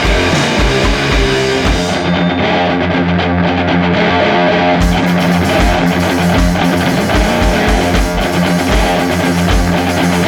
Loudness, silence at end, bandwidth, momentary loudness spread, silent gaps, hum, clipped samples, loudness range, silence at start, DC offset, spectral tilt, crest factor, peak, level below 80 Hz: -12 LUFS; 0 s; 18.5 kHz; 2 LU; none; none; under 0.1%; 1 LU; 0 s; under 0.1%; -5.5 dB/octave; 12 dB; 0 dBFS; -20 dBFS